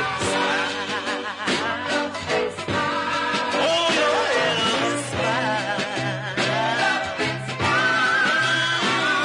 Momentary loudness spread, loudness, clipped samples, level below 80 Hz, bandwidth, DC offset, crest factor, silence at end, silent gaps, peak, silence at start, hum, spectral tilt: 7 LU; -21 LUFS; under 0.1%; -58 dBFS; 11 kHz; under 0.1%; 14 dB; 0 s; none; -8 dBFS; 0 s; none; -3 dB/octave